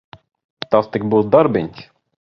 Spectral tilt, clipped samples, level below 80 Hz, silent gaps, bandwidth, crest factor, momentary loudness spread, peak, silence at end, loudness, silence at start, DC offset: -9 dB/octave; under 0.1%; -52 dBFS; none; 6 kHz; 18 dB; 14 LU; 0 dBFS; 0.5 s; -16 LUFS; 0.7 s; under 0.1%